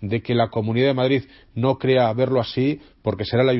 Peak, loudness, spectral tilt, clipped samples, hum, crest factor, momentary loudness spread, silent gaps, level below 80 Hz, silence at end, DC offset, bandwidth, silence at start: -4 dBFS; -21 LUFS; -11 dB/octave; under 0.1%; none; 16 dB; 7 LU; none; -54 dBFS; 0 s; under 0.1%; 5.8 kHz; 0 s